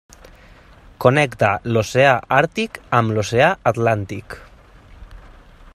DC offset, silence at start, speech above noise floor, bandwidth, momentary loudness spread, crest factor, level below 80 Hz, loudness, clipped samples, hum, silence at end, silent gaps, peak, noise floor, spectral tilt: under 0.1%; 1 s; 28 dB; 14.5 kHz; 12 LU; 20 dB; -46 dBFS; -17 LUFS; under 0.1%; none; 0.55 s; none; 0 dBFS; -46 dBFS; -5.5 dB/octave